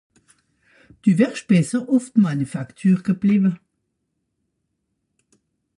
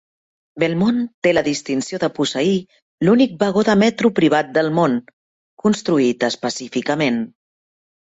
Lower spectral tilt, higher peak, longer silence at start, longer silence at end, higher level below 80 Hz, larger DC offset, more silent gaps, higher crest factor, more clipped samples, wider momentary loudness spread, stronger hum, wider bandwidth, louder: first, -7.5 dB/octave vs -5.5 dB/octave; about the same, -4 dBFS vs -2 dBFS; first, 1.05 s vs 0.55 s; first, 2.2 s vs 0.75 s; second, -64 dBFS vs -56 dBFS; neither; second, none vs 1.14-1.22 s, 2.82-2.98 s, 5.13-5.57 s; about the same, 18 dB vs 16 dB; neither; about the same, 6 LU vs 8 LU; neither; first, 11.5 kHz vs 8 kHz; about the same, -20 LUFS vs -18 LUFS